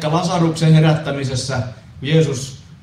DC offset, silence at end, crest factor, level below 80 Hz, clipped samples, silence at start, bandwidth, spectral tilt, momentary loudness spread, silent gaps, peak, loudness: under 0.1%; 0.1 s; 16 dB; -46 dBFS; under 0.1%; 0 s; 11 kHz; -6 dB/octave; 15 LU; none; -2 dBFS; -17 LUFS